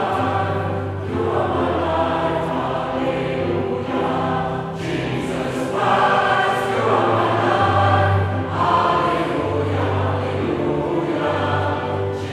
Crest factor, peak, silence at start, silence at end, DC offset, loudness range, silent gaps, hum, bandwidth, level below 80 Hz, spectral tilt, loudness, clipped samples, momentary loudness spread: 16 dB; -4 dBFS; 0 s; 0 s; under 0.1%; 4 LU; none; none; 12 kHz; -46 dBFS; -7 dB/octave; -20 LUFS; under 0.1%; 7 LU